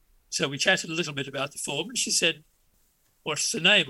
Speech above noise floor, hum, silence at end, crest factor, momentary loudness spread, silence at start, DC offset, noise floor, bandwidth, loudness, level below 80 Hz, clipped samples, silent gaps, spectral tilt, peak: 40 dB; none; 0 s; 22 dB; 10 LU; 0.3 s; under 0.1%; -66 dBFS; 16.5 kHz; -26 LUFS; -68 dBFS; under 0.1%; none; -1.5 dB/octave; -6 dBFS